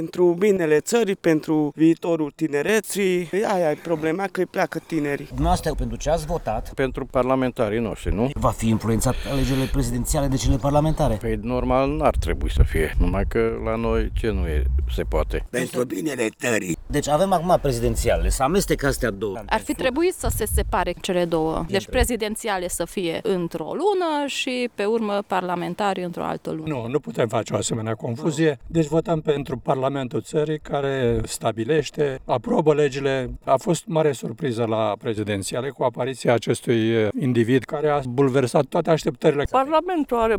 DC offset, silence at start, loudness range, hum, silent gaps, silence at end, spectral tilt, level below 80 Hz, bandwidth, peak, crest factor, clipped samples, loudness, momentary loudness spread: under 0.1%; 0 s; 3 LU; none; none; 0 s; -5.5 dB/octave; -32 dBFS; over 20 kHz; -4 dBFS; 18 dB; under 0.1%; -23 LUFS; 6 LU